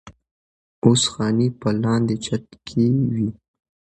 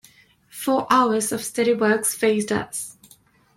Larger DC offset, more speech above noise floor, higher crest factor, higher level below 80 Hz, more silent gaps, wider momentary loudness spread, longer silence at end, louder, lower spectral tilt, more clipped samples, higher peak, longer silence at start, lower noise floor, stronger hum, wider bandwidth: neither; first, over 70 dB vs 34 dB; about the same, 22 dB vs 20 dB; first, -52 dBFS vs -62 dBFS; first, 0.31-0.82 s vs none; about the same, 10 LU vs 12 LU; about the same, 0.65 s vs 0.65 s; about the same, -21 LUFS vs -21 LUFS; first, -5.5 dB/octave vs -3.5 dB/octave; neither; first, 0 dBFS vs -4 dBFS; second, 0.05 s vs 0.55 s; first, under -90 dBFS vs -55 dBFS; neither; second, 11.5 kHz vs 16.5 kHz